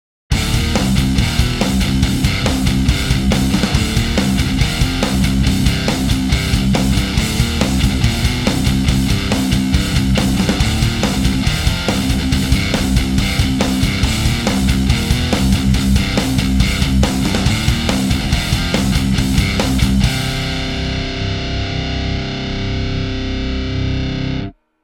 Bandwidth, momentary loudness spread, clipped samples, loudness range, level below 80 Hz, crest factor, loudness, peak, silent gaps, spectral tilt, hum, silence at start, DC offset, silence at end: 17.5 kHz; 5 LU; under 0.1%; 3 LU; -20 dBFS; 16 dB; -16 LUFS; 0 dBFS; none; -5 dB/octave; none; 0.3 s; under 0.1%; 0.35 s